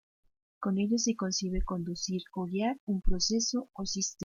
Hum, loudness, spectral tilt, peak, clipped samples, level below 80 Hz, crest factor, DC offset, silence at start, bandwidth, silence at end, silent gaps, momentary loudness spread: none; -32 LUFS; -4 dB/octave; -14 dBFS; under 0.1%; -40 dBFS; 18 dB; under 0.1%; 0.6 s; 7.4 kHz; 0 s; 2.80-2.87 s; 7 LU